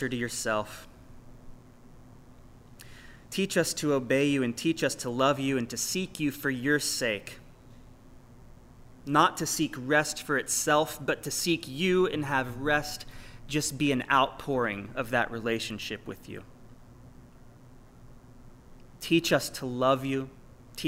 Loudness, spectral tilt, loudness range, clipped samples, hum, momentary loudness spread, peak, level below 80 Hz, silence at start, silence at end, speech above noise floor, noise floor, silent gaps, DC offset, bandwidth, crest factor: -28 LUFS; -4 dB/octave; 9 LU; under 0.1%; none; 17 LU; -8 dBFS; -54 dBFS; 0 s; 0 s; 23 dB; -52 dBFS; none; under 0.1%; 16 kHz; 22 dB